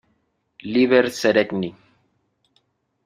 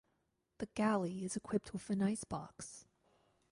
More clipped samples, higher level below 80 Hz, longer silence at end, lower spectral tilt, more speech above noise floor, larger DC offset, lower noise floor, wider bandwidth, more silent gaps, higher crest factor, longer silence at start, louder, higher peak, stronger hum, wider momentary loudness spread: neither; about the same, -64 dBFS vs -68 dBFS; first, 1.35 s vs 0.7 s; about the same, -5 dB/octave vs -5.5 dB/octave; first, 50 dB vs 44 dB; neither; second, -69 dBFS vs -82 dBFS; first, 15 kHz vs 11.5 kHz; neither; about the same, 22 dB vs 18 dB; about the same, 0.65 s vs 0.6 s; first, -19 LUFS vs -39 LUFS; first, -2 dBFS vs -22 dBFS; neither; about the same, 14 LU vs 15 LU